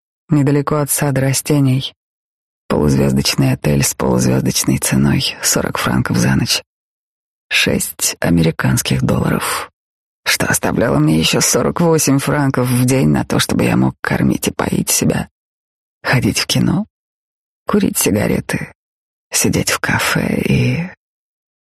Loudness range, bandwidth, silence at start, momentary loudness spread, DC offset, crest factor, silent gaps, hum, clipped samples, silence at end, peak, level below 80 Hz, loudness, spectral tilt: 4 LU; 13 kHz; 0.3 s; 6 LU; under 0.1%; 14 dB; 1.96-2.69 s, 6.66-7.50 s, 9.73-10.23 s, 15.31-16.01 s, 16.90-17.66 s, 18.75-19.31 s; none; under 0.1%; 0.7 s; -2 dBFS; -38 dBFS; -15 LUFS; -4.5 dB/octave